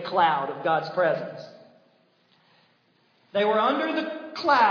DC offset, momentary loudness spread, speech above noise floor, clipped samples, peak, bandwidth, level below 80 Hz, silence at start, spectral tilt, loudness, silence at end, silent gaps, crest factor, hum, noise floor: under 0.1%; 12 LU; 41 dB; under 0.1%; -8 dBFS; 5.4 kHz; -84 dBFS; 0 s; -5.5 dB/octave; -25 LUFS; 0 s; none; 18 dB; none; -64 dBFS